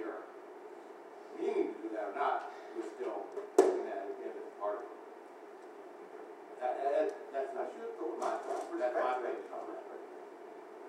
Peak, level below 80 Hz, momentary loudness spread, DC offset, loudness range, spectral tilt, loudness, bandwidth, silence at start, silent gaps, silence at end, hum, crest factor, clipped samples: -10 dBFS; under -90 dBFS; 18 LU; under 0.1%; 4 LU; -3.5 dB/octave; -37 LUFS; 13 kHz; 0 s; none; 0 s; none; 28 dB; under 0.1%